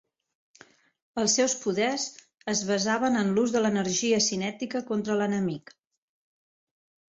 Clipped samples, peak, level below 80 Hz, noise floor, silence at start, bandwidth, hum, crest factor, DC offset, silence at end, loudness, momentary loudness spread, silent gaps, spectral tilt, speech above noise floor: under 0.1%; -10 dBFS; -68 dBFS; -57 dBFS; 1.15 s; 8.4 kHz; none; 18 dB; under 0.1%; 1.55 s; -26 LUFS; 9 LU; none; -3.5 dB/octave; 31 dB